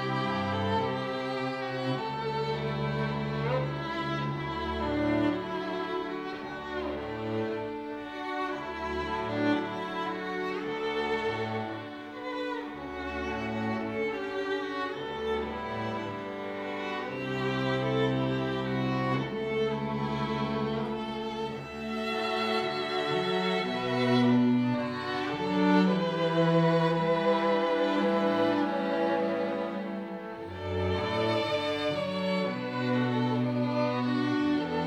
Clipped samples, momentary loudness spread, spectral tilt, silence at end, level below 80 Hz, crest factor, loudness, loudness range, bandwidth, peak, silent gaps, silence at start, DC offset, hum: under 0.1%; 9 LU; -7 dB/octave; 0 s; -56 dBFS; 18 dB; -30 LUFS; 7 LU; 11.5 kHz; -12 dBFS; none; 0 s; under 0.1%; none